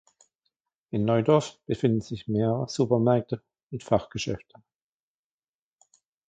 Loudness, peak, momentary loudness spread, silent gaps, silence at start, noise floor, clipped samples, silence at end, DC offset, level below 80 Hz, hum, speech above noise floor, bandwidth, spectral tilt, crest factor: -26 LUFS; -6 dBFS; 14 LU; 3.63-3.67 s; 0.95 s; under -90 dBFS; under 0.1%; 1.9 s; under 0.1%; -58 dBFS; none; over 64 dB; 9.2 kHz; -7 dB/octave; 22 dB